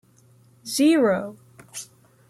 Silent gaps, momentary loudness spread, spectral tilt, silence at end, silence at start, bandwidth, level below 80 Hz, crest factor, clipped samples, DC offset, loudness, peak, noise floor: none; 22 LU; -4 dB/octave; 0.45 s; 0.65 s; 15 kHz; -70 dBFS; 16 dB; under 0.1%; under 0.1%; -21 LUFS; -10 dBFS; -56 dBFS